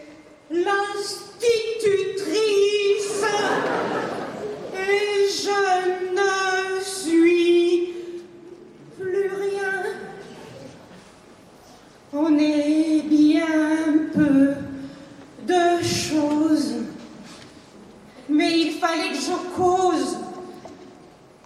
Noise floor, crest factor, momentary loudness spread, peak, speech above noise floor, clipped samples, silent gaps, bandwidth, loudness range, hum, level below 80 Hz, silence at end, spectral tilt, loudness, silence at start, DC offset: -48 dBFS; 14 dB; 20 LU; -8 dBFS; 26 dB; under 0.1%; none; 13 kHz; 7 LU; none; -62 dBFS; 0.45 s; -4 dB/octave; -21 LUFS; 0 s; under 0.1%